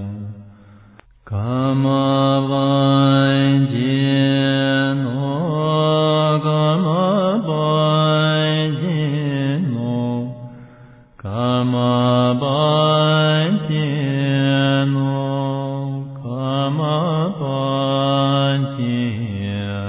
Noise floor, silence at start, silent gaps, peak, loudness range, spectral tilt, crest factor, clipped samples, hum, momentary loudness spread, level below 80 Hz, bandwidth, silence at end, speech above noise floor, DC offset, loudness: -47 dBFS; 0 s; none; -4 dBFS; 4 LU; -11 dB/octave; 14 dB; under 0.1%; none; 9 LU; -50 dBFS; 4 kHz; 0 s; 30 dB; under 0.1%; -18 LUFS